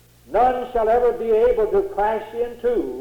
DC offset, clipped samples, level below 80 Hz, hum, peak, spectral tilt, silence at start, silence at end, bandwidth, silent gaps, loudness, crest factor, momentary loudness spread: under 0.1%; under 0.1%; -42 dBFS; none; -8 dBFS; -6.5 dB/octave; 0.3 s; 0 s; 18 kHz; none; -20 LUFS; 12 dB; 7 LU